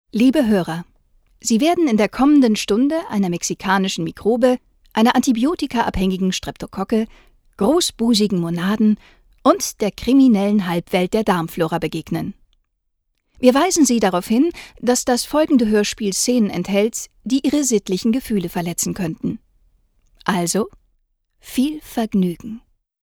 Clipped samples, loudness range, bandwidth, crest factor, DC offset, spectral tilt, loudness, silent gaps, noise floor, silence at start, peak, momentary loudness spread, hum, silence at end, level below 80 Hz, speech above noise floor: under 0.1%; 6 LU; 19.5 kHz; 18 dB; under 0.1%; -4.5 dB/octave; -18 LUFS; none; -71 dBFS; 0.15 s; 0 dBFS; 11 LU; none; 0.45 s; -46 dBFS; 53 dB